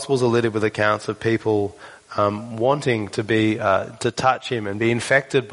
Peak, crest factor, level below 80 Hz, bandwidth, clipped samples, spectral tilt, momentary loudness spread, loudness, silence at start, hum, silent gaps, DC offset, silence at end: -2 dBFS; 18 dB; -58 dBFS; 11 kHz; under 0.1%; -5.5 dB/octave; 5 LU; -21 LUFS; 0 s; none; none; under 0.1%; 0 s